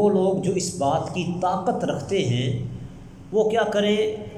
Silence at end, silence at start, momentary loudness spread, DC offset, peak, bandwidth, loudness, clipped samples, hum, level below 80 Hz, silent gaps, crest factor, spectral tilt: 0 s; 0 s; 10 LU; under 0.1%; -8 dBFS; 12.5 kHz; -23 LUFS; under 0.1%; none; -50 dBFS; none; 14 dB; -5.5 dB/octave